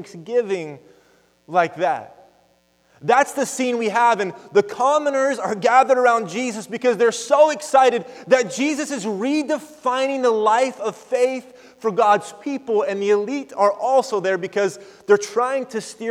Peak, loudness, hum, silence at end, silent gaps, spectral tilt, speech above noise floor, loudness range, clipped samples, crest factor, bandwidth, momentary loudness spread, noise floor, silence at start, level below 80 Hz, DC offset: -2 dBFS; -20 LUFS; none; 0 s; none; -4 dB/octave; 41 dB; 4 LU; under 0.1%; 18 dB; 14.5 kHz; 10 LU; -60 dBFS; 0 s; -74 dBFS; under 0.1%